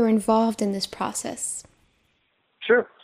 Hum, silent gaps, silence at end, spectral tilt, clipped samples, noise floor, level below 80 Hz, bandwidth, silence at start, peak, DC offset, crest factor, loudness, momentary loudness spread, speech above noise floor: none; none; 0.15 s; -4 dB/octave; under 0.1%; -69 dBFS; -62 dBFS; 15.5 kHz; 0 s; -6 dBFS; under 0.1%; 18 dB; -24 LUFS; 10 LU; 46 dB